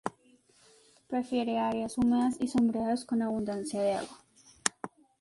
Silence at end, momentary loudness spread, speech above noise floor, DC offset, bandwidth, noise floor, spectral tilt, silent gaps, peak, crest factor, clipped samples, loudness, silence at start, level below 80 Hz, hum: 0.35 s; 9 LU; 34 dB; under 0.1%; 11.5 kHz; -64 dBFS; -4.5 dB/octave; none; -4 dBFS; 28 dB; under 0.1%; -31 LUFS; 0.05 s; -64 dBFS; none